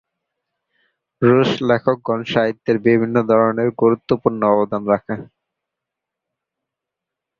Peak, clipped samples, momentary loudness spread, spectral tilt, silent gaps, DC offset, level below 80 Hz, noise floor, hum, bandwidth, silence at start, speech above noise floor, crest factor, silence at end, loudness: -2 dBFS; under 0.1%; 5 LU; -8 dB/octave; none; under 0.1%; -58 dBFS; -84 dBFS; none; 7.2 kHz; 1.2 s; 67 dB; 18 dB; 2.15 s; -17 LUFS